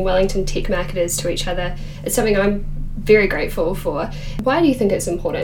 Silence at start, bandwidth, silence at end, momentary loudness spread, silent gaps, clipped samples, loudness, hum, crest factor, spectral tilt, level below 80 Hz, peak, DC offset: 0 s; 18 kHz; 0 s; 11 LU; none; under 0.1%; -19 LUFS; none; 18 dB; -4.5 dB/octave; -26 dBFS; -2 dBFS; under 0.1%